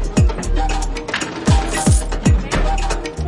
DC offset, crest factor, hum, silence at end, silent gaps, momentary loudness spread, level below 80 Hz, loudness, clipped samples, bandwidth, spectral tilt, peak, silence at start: 0.2%; 14 dB; none; 0 s; none; 6 LU; -20 dBFS; -18 LUFS; under 0.1%; 11.5 kHz; -5 dB/octave; -4 dBFS; 0 s